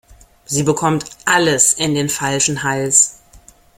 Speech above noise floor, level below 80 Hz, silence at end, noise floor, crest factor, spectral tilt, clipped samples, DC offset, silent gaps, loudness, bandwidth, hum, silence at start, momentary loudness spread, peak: 30 dB; -50 dBFS; 0.65 s; -46 dBFS; 18 dB; -2.5 dB/octave; under 0.1%; under 0.1%; none; -15 LUFS; 16.5 kHz; none; 0.5 s; 7 LU; 0 dBFS